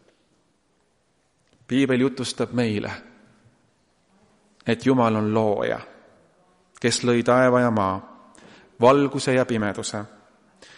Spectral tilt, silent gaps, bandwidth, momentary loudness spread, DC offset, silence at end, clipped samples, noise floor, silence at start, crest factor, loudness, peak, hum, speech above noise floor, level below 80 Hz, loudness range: -5.5 dB/octave; none; 11.5 kHz; 14 LU; under 0.1%; 0.7 s; under 0.1%; -67 dBFS; 1.7 s; 20 dB; -22 LUFS; -4 dBFS; none; 46 dB; -62 dBFS; 6 LU